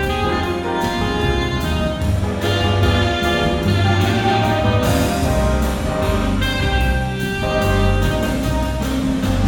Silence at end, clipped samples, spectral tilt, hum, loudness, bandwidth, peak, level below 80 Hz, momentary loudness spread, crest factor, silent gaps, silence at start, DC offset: 0 s; under 0.1%; -6 dB/octave; none; -18 LUFS; 18.5 kHz; -4 dBFS; -24 dBFS; 4 LU; 14 dB; none; 0 s; under 0.1%